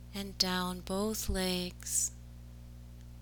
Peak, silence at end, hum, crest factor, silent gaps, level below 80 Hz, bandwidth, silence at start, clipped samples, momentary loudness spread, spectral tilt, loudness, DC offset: -12 dBFS; 0 s; 60 Hz at -45 dBFS; 24 dB; none; -46 dBFS; over 20 kHz; 0 s; under 0.1%; 21 LU; -3 dB/octave; -33 LUFS; under 0.1%